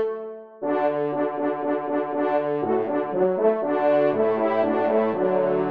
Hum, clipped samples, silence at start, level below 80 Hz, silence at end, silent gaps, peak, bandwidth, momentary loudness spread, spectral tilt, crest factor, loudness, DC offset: none; under 0.1%; 0 s; -74 dBFS; 0 s; none; -8 dBFS; 4.9 kHz; 5 LU; -9.5 dB/octave; 14 dB; -23 LUFS; 0.2%